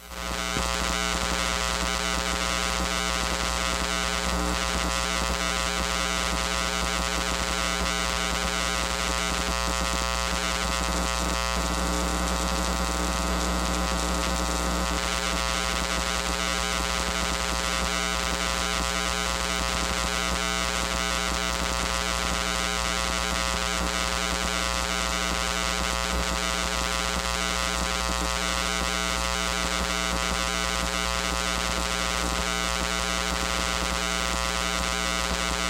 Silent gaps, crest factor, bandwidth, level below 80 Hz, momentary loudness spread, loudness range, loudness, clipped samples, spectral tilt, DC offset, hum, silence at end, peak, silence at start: none; 18 dB; 16.5 kHz; -34 dBFS; 1 LU; 1 LU; -26 LUFS; under 0.1%; -2.5 dB/octave; under 0.1%; 60 Hz at -35 dBFS; 0 s; -8 dBFS; 0 s